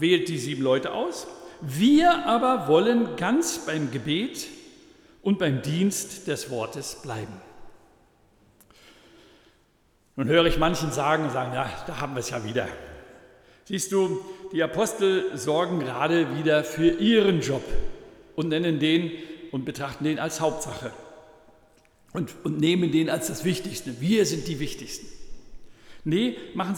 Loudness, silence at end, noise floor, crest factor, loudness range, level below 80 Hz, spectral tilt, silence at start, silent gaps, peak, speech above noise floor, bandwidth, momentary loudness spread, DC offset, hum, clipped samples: -25 LUFS; 0 s; -64 dBFS; 18 dB; 9 LU; -44 dBFS; -5 dB/octave; 0 s; none; -8 dBFS; 39 dB; 18.5 kHz; 16 LU; under 0.1%; none; under 0.1%